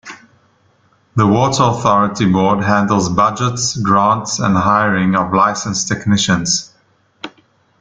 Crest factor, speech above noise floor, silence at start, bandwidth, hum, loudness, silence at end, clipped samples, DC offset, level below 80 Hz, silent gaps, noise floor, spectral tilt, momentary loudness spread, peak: 16 dB; 42 dB; 0.05 s; 9.4 kHz; none; -14 LUFS; 0.5 s; under 0.1%; under 0.1%; -46 dBFS; none; -56 dBFS; -4.5 dB/octave; 6 LU; 0 dBFS